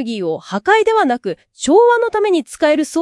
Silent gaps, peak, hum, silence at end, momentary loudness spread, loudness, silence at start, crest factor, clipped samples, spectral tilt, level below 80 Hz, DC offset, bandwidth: none; 0 dBFS; none; 0 s; 11 LU; -15 LUFS; 0 s; 14 dB; under 0.1%; -4 dB/octave; -56 dBFS; under 0.1%; 12 kHz